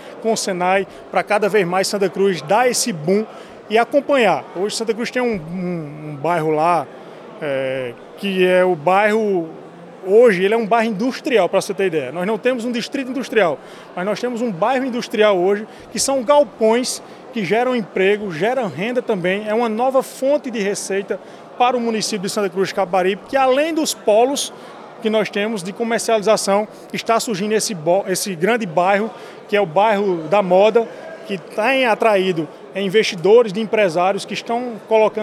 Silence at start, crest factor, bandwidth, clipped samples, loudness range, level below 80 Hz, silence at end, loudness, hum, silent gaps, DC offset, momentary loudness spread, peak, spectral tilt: 0 s; 16 dB; 15 kHz; under 0.1%; 3 LU; -64 dBFS; 0 s; -18 LUFS; none; none; under 0.1%; 11 LU; -2 dBFS; -4 dB/octave